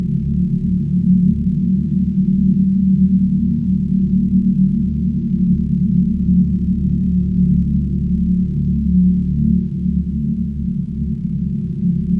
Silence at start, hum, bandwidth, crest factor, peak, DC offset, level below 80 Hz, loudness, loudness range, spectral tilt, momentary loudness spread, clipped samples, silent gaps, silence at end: 0 s; none; 0.6 kHz; 12 dB; -4 dBFS; under 0.1%; -28 dBFS; -17 LUFS; 2 LU; -12.5 dB/octave; 6 LU; under 0.1%; none; 0 s